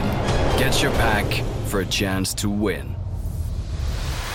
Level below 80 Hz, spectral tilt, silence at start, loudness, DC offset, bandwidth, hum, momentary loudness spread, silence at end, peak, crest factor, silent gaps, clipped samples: -28 dBFS; -4.5 dB/octave; 0 s; -23 LUFS; under 0.1%; 17 kHz; none; 10 LU; 0 s; -8 dBFS; 14 dB; none; under 0.1%